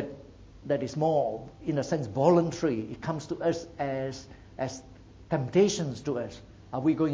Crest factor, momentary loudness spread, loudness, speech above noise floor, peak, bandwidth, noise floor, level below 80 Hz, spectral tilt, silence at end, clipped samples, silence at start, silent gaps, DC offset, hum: 20 dB; 16 LU; -29 LUFS; 21 dB; -8 dBFS; 8 kHz; -49 dBFS; -56 dBFS; -6.5 dB/octave; 0 s; under 0.1%; 0 s; none; under 0.1%; none